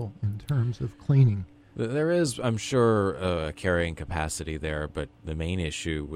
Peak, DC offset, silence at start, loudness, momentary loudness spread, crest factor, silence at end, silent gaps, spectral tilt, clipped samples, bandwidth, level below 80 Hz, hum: -10 dBFS; under 0.1%; 0 s; -27 LUFS; 11 LU; 18 dB; 0 s; none; -6 dB/octave; under 0.1%; 13 kHz; -44 dBFS; none